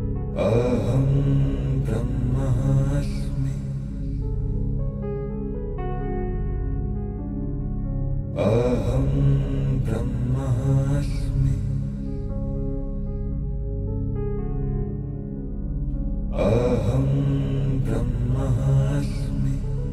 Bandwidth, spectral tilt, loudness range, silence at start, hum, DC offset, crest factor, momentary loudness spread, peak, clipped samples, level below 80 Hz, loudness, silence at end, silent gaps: 11 kHz; -9 dB/octave; 6 LU; 0 s; 50 Hz at -35 dBFS; under 0.1%; 16 dB; 9 LU; -8 dBFS; under 0.1%; -28 dBFS; -25 LUFS; 0 s; none